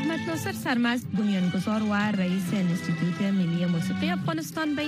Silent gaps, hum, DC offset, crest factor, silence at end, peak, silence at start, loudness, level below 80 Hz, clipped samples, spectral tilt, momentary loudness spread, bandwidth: none; none; under 0.1%; 14 dB; 0 s; -12 dBFS; 0 s; -27 LUFS; -66 dBFS; under 0.1%; -6 dB/octave; 4 LU; 15.5 kHz